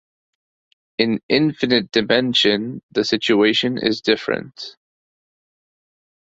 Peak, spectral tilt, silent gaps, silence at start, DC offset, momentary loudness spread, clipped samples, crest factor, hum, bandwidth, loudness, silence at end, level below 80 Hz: 0 dBFS; -5 dB/octave; 1.23-1.29 s, 2.83-2.89 s; 1 s; under 0.1%; 10 LU; under 0.1%; 20 dB; none; 8 kHz; -18 LUFS; 1.6 s; -58 dBFS